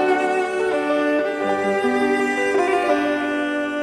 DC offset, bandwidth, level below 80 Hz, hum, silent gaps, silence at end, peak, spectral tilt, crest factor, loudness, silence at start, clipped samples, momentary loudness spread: under 0.1%; 12.5 kHz; -58 dBFS; none; none; 0 s; -6 dBFS; -4.5 dB/octave; 14 dB; -20 LUFS; 0 s; under 0.1%; 3 LU